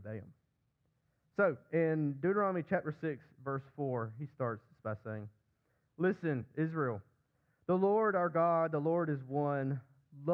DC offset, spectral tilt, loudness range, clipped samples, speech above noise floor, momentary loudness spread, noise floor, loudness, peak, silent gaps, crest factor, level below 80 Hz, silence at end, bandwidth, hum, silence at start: under 0.1%; -11 dB/octave; 6 LU; under 0.1%; 45 dB; 13 LU; -79 dBFS; -35 LUFS; -20 dBFS; none; 16 dB; -78 dBFS; 0 s; 5.6 kHz; none; 0 s